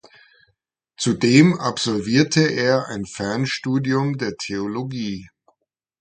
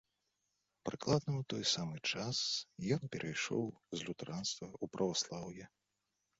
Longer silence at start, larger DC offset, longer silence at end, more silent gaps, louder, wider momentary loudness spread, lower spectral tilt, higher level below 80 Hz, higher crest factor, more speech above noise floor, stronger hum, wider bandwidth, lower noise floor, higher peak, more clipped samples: first, 1 s vs 0.85 s; neither; about the same, 0.75 s vs 0.7 s; neither; first, -20 LUFS vs -39 LUFS; about the same, 13 LU vs 11 LU; about the same, -5 dB/octave vs -4 dB/octave; first, -56 dBFS vs -70 dBFS; about the same, 20 dB vs 20 dB; first, 53 dB vs 47 dB; neither; first, 9.4 kHz vs 7.6 kHz; second, -73 dBFS vs -86 dBFS; first, 0 dBFS vs -20 dBFS; neither